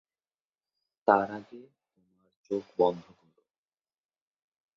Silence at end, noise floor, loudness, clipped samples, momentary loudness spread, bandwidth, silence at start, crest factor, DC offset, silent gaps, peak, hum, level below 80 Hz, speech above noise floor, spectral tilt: 1.75 s; under -90 dBFS; -29 LUFS; under 0.1%; 15 LU; 7 kHz; 1.05 s; 28 dB; under 0.1%; 2.36-2.44 s; -6 dBFS; none; -74 dBFS; over 61 dB; -7.5 dB/octave